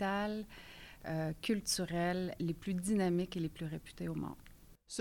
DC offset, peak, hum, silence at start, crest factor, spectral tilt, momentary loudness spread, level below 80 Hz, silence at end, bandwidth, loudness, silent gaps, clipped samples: under 0.1%; -22 dBFS; none; 0 s; 16 dB; -5 dB/octave; 14 LU; -58 dBFS; 0 s; 18.5 kHz; -38 LUFS; none; under 0.1%